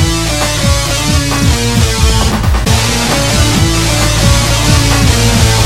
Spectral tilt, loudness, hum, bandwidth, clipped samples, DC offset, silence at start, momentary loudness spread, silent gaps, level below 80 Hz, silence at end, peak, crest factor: -4 dB/octave; -10 LUFS; none; 16.5 kHz; 0.2%; 2%; 0 s; 3 LU; none; -16 dBFS; 0 s; 0 dBFS; 10 dB